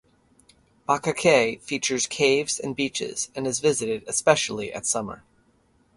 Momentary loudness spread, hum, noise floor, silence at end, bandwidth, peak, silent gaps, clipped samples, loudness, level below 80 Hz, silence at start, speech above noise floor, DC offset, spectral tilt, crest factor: 8 LU; none; -63 dBFS; 0.8 s; 11.5 kHz; -4 dBFS; none; under 0.1%; -24 LUFS; -60 dBFS; 0.9 s; 39 dB; under 0.1%; -2.5 dB/octave; 22 dB